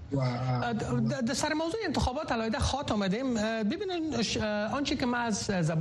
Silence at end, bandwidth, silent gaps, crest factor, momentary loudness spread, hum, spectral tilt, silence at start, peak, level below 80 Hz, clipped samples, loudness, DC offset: 0 s; 12 kHz; none; 14 dB; 2 LU; none; -5 dB/octave; 0 s; -16 dBFS; -46 dBFS; under 0.1%; -30 LUFS; under 0.1%